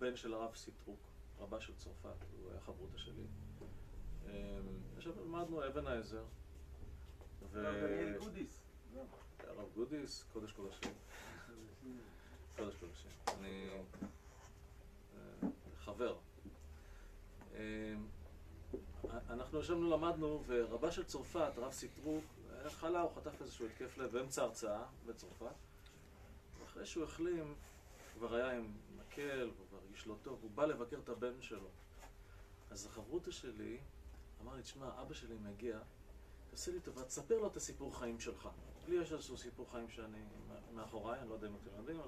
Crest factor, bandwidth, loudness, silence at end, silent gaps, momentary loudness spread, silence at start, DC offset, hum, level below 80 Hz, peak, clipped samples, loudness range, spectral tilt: 24 dB; 14.5 kHz; -46 LUFS; 0 s; none; 18 LU; 0 s; under 0.1%; none; -58 dBFS; -22 dBFS; under 0.1%; 9 LU; -5 dB/octave